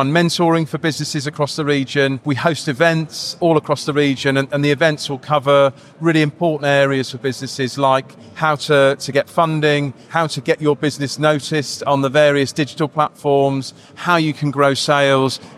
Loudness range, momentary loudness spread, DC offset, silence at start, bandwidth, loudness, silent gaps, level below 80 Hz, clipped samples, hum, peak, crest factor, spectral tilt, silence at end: 1 LU; 7 LU; under 0.1%; 0 s; 14 kHz; -17 LUFS; none; -60 dBFS; under 0.1%; none; -2 dBFS; 16 dB; -5 dB/octave; 0 s